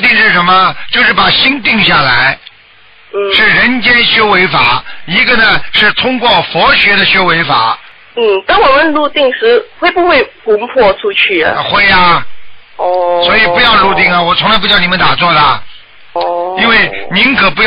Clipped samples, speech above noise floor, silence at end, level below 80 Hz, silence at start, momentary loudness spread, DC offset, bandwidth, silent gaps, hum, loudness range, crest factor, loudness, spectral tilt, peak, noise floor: under 0.1%; 32 dB; 0 s; -34 dBFS; 0 s; 8 LU; under 0.1%; 5.4 kHz; none; none; 2 LU; 8 dB; -7 LUFS; -6.5 dB/octave; 0 dBFS; -41 dBFS